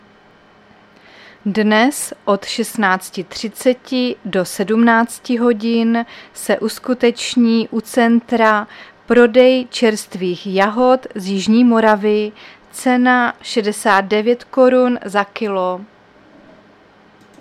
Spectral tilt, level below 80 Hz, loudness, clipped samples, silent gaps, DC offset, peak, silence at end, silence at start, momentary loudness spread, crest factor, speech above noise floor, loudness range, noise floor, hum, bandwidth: -4.5 dB/octave; -58 dBFS; -15 LUFS; under 0.1%; none; under 0.1%; 0 dBFS; 1.55 s; 1.45 s; 10 LU; 16 dB; 33 dB; 4 LU; -48 dBFS; none; 14.5 kHz